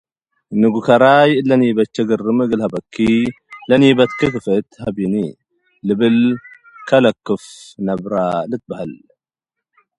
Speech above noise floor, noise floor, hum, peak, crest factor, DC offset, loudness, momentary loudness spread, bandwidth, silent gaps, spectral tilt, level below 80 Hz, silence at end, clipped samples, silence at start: 68 dB; -83 dBFS; none; 0 dBFS; 16 dB; under 0.1%; -16 LUFS; 14 LU; 11 kHz; none; -7 dB/octave; -52 dBFS; 1.05 s; under 0.1%; 0.5 s